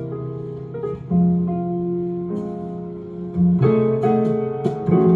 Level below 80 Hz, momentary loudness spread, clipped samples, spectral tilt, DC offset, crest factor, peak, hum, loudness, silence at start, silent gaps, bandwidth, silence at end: -52 dBFS; 13 LU; under 0.1%; -11.5 dB/octave; under 0.1%; 14 dB; -6 dBFS; none; -21 LUFS; 0 s; none; 4.2 kHz; 0 s